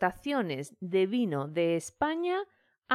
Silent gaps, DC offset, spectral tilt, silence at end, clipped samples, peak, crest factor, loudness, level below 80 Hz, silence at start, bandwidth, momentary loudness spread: none; under 0.1%; -5.5 dB/octave; 0 s; under 0.1%; -12 dBFS; 18 dB; -31 LUFS; -66 dBFS; 0 s; 14 kHz; 7 LU